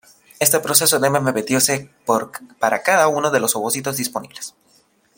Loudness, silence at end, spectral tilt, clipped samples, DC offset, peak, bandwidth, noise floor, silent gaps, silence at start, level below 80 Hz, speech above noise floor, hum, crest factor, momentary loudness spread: -17 LUFS; 0.7 s; -2.5 dB/octave; under 0.1%; under 0.1%; 0 dBFS; 17 kHz; -58 dBFS; none; 0.4 s; -64 dBFS; 39 dB; none; 20 dB; 14 LU